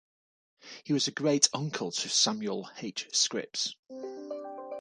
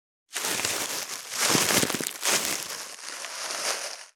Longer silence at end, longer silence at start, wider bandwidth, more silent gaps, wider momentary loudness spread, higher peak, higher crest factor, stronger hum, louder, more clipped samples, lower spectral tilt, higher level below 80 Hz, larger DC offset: about the same, 0 s vs 0.05 s; first, 0.65 s vs 0.3 s; second, 11 kHz vs over 20 kHz; first, 3.79-3.83 s vs none; first, 16 LU vs 13 LU; about the same, -6 dBFS vs -4 dBFS; about the same, 26 dB vs 24 dB; neither; second, -29 LUFS vs -26 LUFS; neither; first, -2.5 dB/octave vs -1 dB/octave; second, -80 dBFS vs -70 dBFS; neither